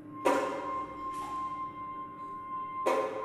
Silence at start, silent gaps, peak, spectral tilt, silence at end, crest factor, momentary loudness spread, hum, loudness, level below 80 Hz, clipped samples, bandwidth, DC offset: 0 s; none; -14 dBFS; -4.5 dB/octave; 0 s; 22 dB; 11 LU; none; -35 LUFS; -66 dBFS; under 0.1%; 15 kHz; under 0.1%